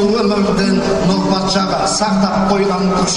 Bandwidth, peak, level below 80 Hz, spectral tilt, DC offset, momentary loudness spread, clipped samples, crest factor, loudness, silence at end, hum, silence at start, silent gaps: 11 kHz; -2 dBFS; -36 dBFS; -5 dB/octave; under 0.1%; 1 LU; under 0.1%; 12 dB; -14 LUFS; 0 s; none; 0 s; none